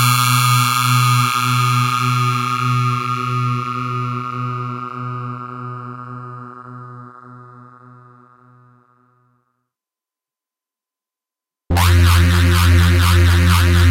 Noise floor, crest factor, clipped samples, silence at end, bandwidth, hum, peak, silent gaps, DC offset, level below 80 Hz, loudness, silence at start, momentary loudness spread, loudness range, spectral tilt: -88 dBFS; 16 dB; under 0.1%; 0 s; 16 kHz; none; -2 dBFS; none; under 0.1%; -30 dBFS; -15 LUFS; 0 s; 19 LU; 20 LU; -4.5 dB/octave